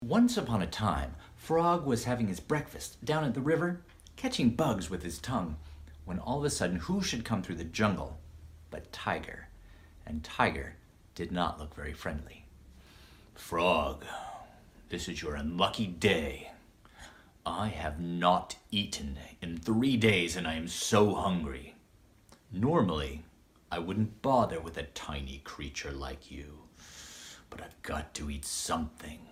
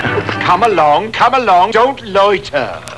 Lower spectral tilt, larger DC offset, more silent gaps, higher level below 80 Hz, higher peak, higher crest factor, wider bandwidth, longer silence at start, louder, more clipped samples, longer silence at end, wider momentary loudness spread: about the same, -5 dB/octave vs -5 dB/octave; second, under 0.1% vs 0.6%; neither; second, -50 dBFS vs -44 dBFS; second, -10 dBFS vs 0 dBFS; first, 24 dB vs 12 dB; first, 16 kHz vs 11 kHz; about the same, 0 s vs 0 s; second, -32 LUFS vs -12 LUFS; neither; about the same, 0 s vs 0 s; first, 19 LU vs 6 LU